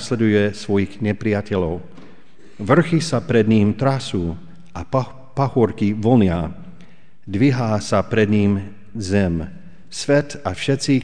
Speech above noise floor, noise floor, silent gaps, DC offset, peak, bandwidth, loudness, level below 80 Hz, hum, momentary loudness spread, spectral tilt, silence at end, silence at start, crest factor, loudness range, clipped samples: 31 dB; -49 dBFS; none; 2%; -2 dBFS; 10 kHz; -19 LUFS; -44 dBFS; none; 14 LU; -6.5 dB/octave; 0 s; 0 s; 18 dB; 1 LU; under 0.1%